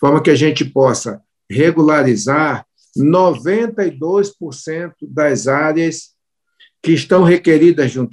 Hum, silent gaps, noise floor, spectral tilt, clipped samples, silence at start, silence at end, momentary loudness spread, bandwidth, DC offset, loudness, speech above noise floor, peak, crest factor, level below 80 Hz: none; none; -57 dBFS; -6 dB/octave; under 0.1%; 0 s; 0.05 s; 14 LU; 11 kHz; under 0.1%; -14 LUFS; 44 dB; -2 dBFS; 14 dB; -58 dBFS